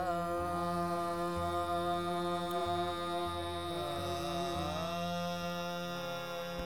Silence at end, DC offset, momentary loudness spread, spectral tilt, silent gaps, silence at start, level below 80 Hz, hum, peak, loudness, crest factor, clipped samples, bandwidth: 0 s; 0.2%; 4 LU; -5.5 dB/octave; none; 0 s; -58 dBFS; none; -24 dBFS; -36 LUFS; 12 dB; under 0.1%; 19 kHz